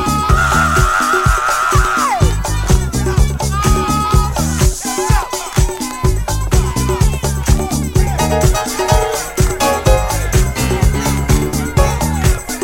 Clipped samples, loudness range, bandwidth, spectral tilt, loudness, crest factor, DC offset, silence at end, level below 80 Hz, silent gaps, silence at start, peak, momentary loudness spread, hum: under 0.1%; 2 LU; 17 kHz; -4.5 dB/octave; -15 LUFS; 14 dB; under 0.1%; 0 s; -18 dBFS; none; 0 s; 0 dBFS; 4 LU; none